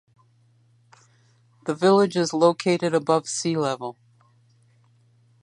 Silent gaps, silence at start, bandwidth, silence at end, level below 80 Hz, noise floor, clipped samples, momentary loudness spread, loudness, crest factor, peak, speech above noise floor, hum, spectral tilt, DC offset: none; 1.65 s; 11 kHz; 1.5 s; -76 dBFS; -60 dBFS; under 0.1%; 13 LU; -22 LUFS; 20 dB; -4 dBFS; 39 dB; none; -5 dB/octave; under 0.1%